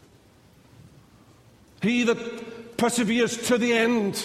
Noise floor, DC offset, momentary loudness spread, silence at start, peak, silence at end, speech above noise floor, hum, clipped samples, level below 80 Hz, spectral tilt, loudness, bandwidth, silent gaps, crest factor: -55 dBFS; under 0.1%; 13 LU; 1.8 s; -10 dBFS; 0 s; 32 dB; none; under 0.1%; -62 dBFS; -4 dB/octave; -24 LUFS; 15 kHz; none; 16 dB